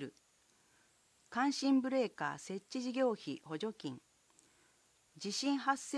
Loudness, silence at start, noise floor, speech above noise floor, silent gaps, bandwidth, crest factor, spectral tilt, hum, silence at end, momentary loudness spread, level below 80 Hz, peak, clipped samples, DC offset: -37 LUFS; 0 s; -71 dBFS; 35 dB; none; 11 kHz; 20 dB; -4 dB/octave; none; 0 s; 14 LU; -86 dBFS; -18 dBFS; under 0.1%; under 0.1%